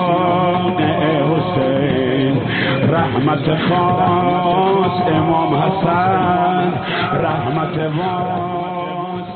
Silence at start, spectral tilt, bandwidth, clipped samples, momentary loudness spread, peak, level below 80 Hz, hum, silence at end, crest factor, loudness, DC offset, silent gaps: 0 s; -5 dB/octave; 4.5 kHz; under 0.1%; 5 LU; -4 dBFS; -46 dBFS; none; 0 s; 12 dB; -16 LUFS; under 0.1%; none